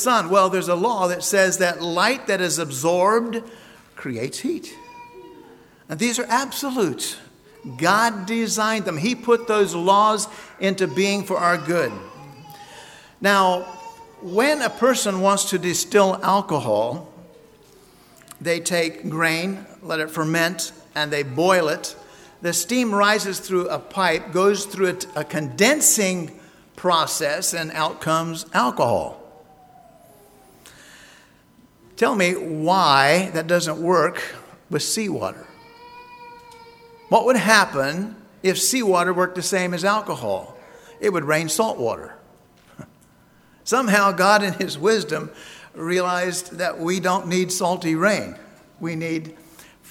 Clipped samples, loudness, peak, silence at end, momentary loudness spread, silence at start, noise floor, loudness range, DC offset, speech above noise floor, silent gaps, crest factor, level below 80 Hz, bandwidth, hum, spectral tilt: under 0.1%; -20 LUFS; 0 dBFS; 0 s; 16 LU; 0 s; -54 dBFS; 6 LU; under 0.1%; 33 dB; none; 22 dB; -62 dBFS; 18 kHz; none; -3.5 dB/octave